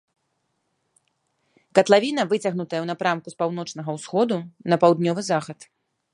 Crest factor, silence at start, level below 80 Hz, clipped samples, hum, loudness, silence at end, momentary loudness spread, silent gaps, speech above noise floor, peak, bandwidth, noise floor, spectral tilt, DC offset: 22 dB; 1.75 s; -72 dBFS; under 0.1%; none; -22 LUFS; 0.6 s; 12 LU; none; 52 dB; -2 dBFS; 11.5 kHz; -74 dBFS; -5.5 dB/octave; under 0.1%